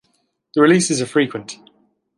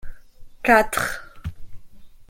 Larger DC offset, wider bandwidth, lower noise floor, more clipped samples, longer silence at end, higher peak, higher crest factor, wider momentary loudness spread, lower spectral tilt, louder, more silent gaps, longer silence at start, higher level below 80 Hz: neither; second, 11.5 kHz vs 16.5 kHz; first, -66 dBFS vs -41 dBFS; neither; first, 0.65 s vs 0.05 s; about the same, -2 dBFS vs -2 dBFS; about the same, 18 dB vs 22 dB; about the same, 21 LU vs 20 LU; about the same, -4.5 dB/octave vs -4 dB/octave; first, -17 LUFS vs -20 LUFS; neither; first, 0.55 s vs 0.05 s; second, -66 dBFS vs -42 dBFS